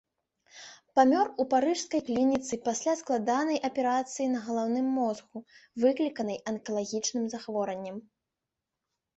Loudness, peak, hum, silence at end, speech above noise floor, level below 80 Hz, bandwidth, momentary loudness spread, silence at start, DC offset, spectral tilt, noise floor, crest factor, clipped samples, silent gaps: -29 LUFS; -10 dBFS; none; 1.15 s; 59 dB; -72 dBFS; 8.2 kHz; 14 LU; 0.55 s; under 0.1%; -4 dB/octave; -87 dBFS; 20 dB; under 0.1%; none